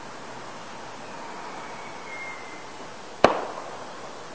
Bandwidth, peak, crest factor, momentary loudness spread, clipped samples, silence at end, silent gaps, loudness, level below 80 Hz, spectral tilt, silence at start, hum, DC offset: 8 kHz; 0 dBFS; 30 dB; 17 LU; under 0.1%; 0 s; none; -31 LUFS; -60 dBFS; -4 dB/octave; 0 s; none; 0.6%